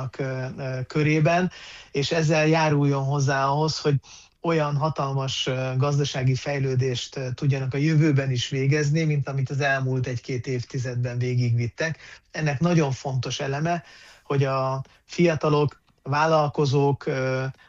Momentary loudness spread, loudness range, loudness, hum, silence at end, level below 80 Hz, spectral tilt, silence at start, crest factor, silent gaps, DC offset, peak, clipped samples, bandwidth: 9 LU; 3 LU; -24 LUFS; none; 0.15 s; -56 dBFS; -6 dB/octave; 0 s; 16 dB; none; under 0.1%; -8 dBFS; under 0.1%; 7.6 kHz